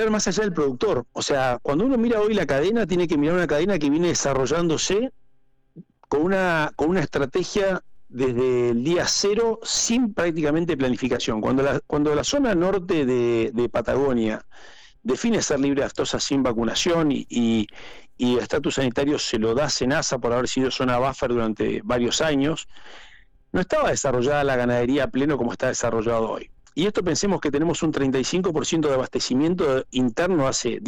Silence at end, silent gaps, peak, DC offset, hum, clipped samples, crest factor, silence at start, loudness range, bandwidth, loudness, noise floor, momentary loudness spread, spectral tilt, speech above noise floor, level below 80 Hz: 0 s; none; -14 dBFS; under 0.1%; none; under 0.1%; 10 dB; 0 s; 2 LU; 17.5 kHz; -22 LUFS; -60 dBFS; 4 LU; -4.5 dB/octave; 38 dB; -44 dBFS